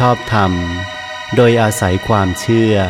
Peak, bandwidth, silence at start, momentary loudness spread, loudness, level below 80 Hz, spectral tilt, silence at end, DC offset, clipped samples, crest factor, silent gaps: 0 dBFS; 16 kHz; 0 s; 11 LU; -14 LUFS; -38 dBFS; -6 dB/octave; 0 s; under 0.1%; under 0.1%; 14 dB; none